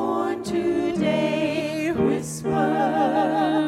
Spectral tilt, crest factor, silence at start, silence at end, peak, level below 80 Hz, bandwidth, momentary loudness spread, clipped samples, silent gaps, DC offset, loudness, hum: -6 dB/octave; 12 dB; 0 s; 0 s; -10 dBFS; -56 dBFS; 14.5 kHz; 4 LU; under 0.1%; none; under 0.1%; -23 LUFS; none